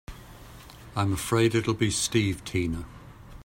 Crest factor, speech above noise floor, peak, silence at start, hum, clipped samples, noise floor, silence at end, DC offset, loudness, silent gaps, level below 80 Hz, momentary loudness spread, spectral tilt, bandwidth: 18 dB; 21 dB; -10 dBFS; 0.1 s; none; under 0.1%; -46 dBFS; 0 s; under 0.1%; -27 LUFS; none; -48 dBFS; 23 LU; -4.5 dB/octave; 16 kHz